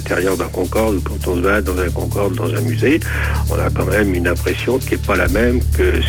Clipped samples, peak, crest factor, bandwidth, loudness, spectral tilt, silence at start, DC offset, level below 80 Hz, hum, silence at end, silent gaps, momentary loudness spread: under 0.1%; -4 dBFS; 12 dB; 18.5 kHz; -17 LUFS; -6 dB/octave; 0 s; under 0.1%; -22 dBFS; none; 0 s; none; 4 LU